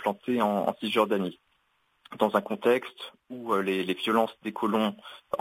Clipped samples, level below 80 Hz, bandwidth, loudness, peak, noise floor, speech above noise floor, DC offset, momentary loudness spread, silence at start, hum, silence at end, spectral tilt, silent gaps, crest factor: under 0.1%; -72 dBFS; 16 kHz; -28 LUFS; -8 dBFS; -71 dBFS; 43 dB; under 0.1%; 15 LU; 0 s; none; 0 s; -5.5 dB/octave; none; 20 dB